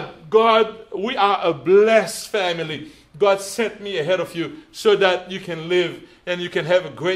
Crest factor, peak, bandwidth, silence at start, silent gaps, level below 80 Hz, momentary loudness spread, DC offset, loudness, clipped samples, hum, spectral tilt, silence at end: 18 dB; -2 dBFS; 15 kHz; 0 s; none; -60 dBFS; 13 LU; under 0.1%; -20 LUFS; under 0.1%; none; -4 dB/octave; 0 s